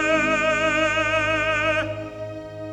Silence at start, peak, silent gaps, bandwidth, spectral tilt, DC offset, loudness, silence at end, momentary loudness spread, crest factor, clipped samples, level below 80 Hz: 0 s; -6 dBFS; none; 10.5 kHz; -4 dB/octave; under 0.1%; -20 LUFS; 0 s; 14 LU; 16 dB; under 0.1%; -46 dBFS